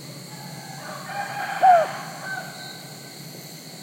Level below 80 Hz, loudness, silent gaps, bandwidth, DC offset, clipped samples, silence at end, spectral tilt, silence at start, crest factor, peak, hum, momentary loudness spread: -78 dBFS; -23 LUFS; none; 16.5 kHz; under 0.1%; under 0.1%; 0 s; -3.5 dB/octave; 0 s; 20 dB; -6 dBFS; none; 21 LU